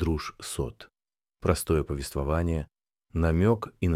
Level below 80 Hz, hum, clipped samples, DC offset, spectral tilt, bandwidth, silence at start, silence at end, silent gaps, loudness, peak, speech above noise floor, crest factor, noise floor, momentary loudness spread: -38 dBFS; none; under 0.1%; under 0.1%; -6.5 dB/octave; 15.5 kHz; 0 s; 0 s; none; -29 LUFS; -10 dBFS; over 63 dB; 18 dB; under -90 dBFS; 11 LU